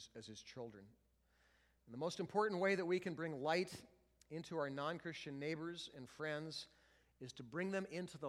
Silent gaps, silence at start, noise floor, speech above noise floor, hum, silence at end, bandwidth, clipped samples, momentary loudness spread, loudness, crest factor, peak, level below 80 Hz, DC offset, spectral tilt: none; 0 s; -76 dBFS; 32 dB; none; 0 s; 14.5 kHz; under 0.1%; 16 LU; -44 LUFS; 22 dB; -24 dBFS; -80 dBFS; under 0.1%; -5 dB/octave